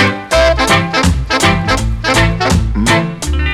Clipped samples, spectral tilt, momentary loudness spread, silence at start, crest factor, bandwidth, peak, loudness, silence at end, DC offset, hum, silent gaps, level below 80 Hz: under 0.1%; -4.5 dB/octave; 4 LU; 0 s; 12 dB; 15.5 kHz; 0 dBFS; -12 LUFS; 0 s; under 0.1%; none; none; -20 dBFS